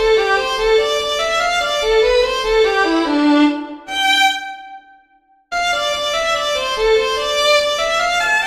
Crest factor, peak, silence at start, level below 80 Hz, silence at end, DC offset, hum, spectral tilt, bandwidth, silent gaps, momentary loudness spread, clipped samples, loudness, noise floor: 14 dB; -2 dBFS; 0 s; -40 dBFS; 0 s; under 0.1%; none; -2 dB/octave; 15 kHz; none; 5 LU; under 0.1%; -15 LUFS; -55 dBFS